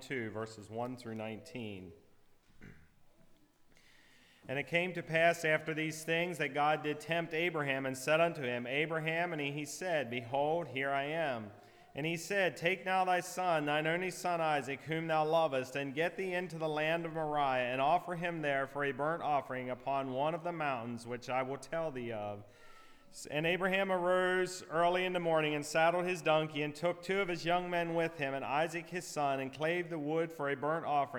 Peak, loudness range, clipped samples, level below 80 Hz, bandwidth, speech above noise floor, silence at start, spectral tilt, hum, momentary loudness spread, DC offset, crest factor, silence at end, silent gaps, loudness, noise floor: -16 dBFS; 6 LU; under 0.1%; -70 dBFS; 19.5 kHz; 30 dB; 0 s; -5 dB/octave; none; 10 LU; under 0.1%; 20 dB; 0 s; none; -35 LUFS; -64 dBFS